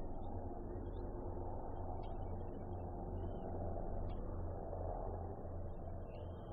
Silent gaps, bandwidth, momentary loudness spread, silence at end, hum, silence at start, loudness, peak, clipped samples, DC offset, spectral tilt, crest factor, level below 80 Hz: none; 3.8 kHz; 4 LU; 0 s; none; 0 s; -47 LUFS; -32 dBFS; under 0.1%; under 0.1%; -8.5 dB/octave; 12 dB; -48 dBFS